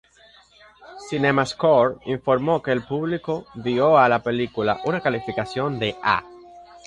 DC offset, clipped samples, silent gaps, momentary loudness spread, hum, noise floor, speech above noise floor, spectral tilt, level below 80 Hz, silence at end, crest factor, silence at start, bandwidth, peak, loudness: under 0.1%; under 0.1%; none; 10 LU; none; -53 dBFS; 32 dB; -6 dB/octave; -56 dBFS; 0.1 s; 20 dB; 0.8 s; 11 kHz; -4 dBFS; -22 LUFS